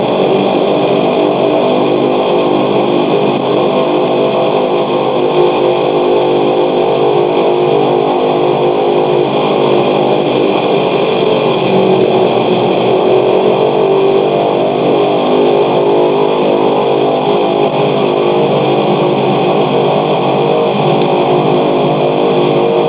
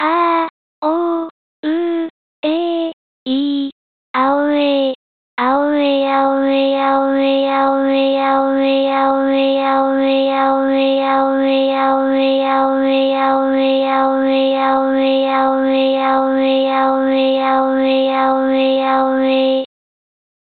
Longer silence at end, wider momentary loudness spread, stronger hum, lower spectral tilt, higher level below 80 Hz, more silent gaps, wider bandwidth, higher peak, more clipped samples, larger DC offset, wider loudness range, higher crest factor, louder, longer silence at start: second, 0 s vs 0.75 s; second, 2 LU vs 6 LU; neither; first, -10.5 dB/octave vs -8 dB/octave; first, -54 dBFS vs -66 dBFS; second, none vs 0.50-0.82 s, 1.31-1.63 s, 2.10-2.43 s, 2.93-3.26 s, 3.72-4.14 s, 4.95-5.37 s; second, 4 kHz vs 4.6 kHz; first, 0 dBFS vs -4 dBFS; neither; second, under 0.1% vs 0.2%; second, 1 LU vs 4 LU; about the same, 10 dB vs 12 dB; first, -11 LUFS vs -15 LUFS; about the same, 0 s vs 0 s